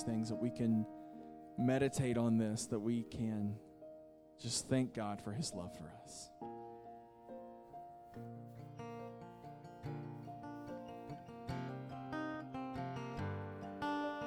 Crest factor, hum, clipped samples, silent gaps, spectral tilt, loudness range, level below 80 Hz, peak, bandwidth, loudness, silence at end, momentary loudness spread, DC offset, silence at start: 20 dB; none; under 0.1%; none; -5.5 dB/octave; 14 LU; -68 dBFS; -22 dBFS; 14.5 kHz; -41 LUFS; 0 s; 18 LU; under 0.1%; 0 s